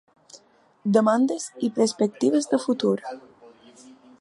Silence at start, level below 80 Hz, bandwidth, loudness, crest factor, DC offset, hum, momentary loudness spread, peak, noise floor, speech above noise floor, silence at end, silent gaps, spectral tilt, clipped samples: 0.35 s; -76 dBFS; 11.5 kHz; -23 LUFS; 20 dB; under 0.1%; none; 10 LU; -6 dBFS; -57 dBFS; 34 dB; 1 s; none; -5.5 dB/octave; under 0.1%